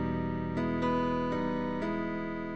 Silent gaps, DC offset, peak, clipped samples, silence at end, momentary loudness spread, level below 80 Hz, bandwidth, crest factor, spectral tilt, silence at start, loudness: none; 0.4%; -18 dBFS; under 0.1%; 0 s; 4 LU; -52 dBFS; 8 kHz; 14 dB; -8 dB/octave; 0 s; -32 LUFS